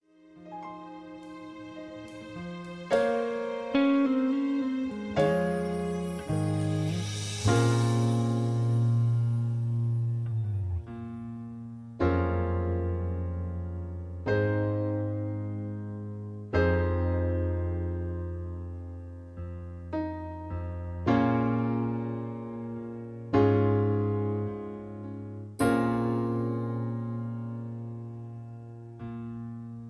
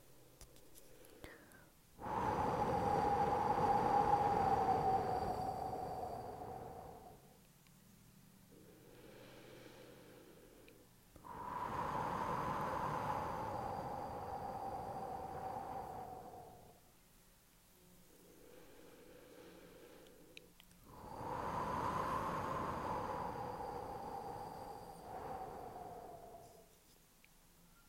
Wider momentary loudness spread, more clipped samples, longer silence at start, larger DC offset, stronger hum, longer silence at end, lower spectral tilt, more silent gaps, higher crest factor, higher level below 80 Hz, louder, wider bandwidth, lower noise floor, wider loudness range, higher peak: second, 16 LU vs 26 LU; neither; first, 0.3 s vs 0.05 s; neither; neither; second, 0 s vs 0.15 s; first, -7.5 dB/octave vs -6 dB/octave; neither; about the same, 20 dB vs 22 dB; first, -48 dBFS vs -62 dBFS; first, -30 LUFS vs -41 LUFS; second, 11 kHz vs 16 kHz; second, -52 dBFS vs -67 dBFS; second, 7 LU vs 24 LU; first, -10 dBFS vs -22 dBFS